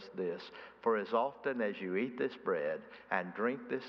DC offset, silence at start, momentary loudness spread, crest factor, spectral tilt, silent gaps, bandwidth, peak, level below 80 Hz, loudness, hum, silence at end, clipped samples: under 0.1%; 0 s; 7 LU; 20 dB; -7.5 dB/octave; none; 6.2 kHz; -16 dBFS; -82 dBFS; -36 LUFS; none; 0 s; under 0.1%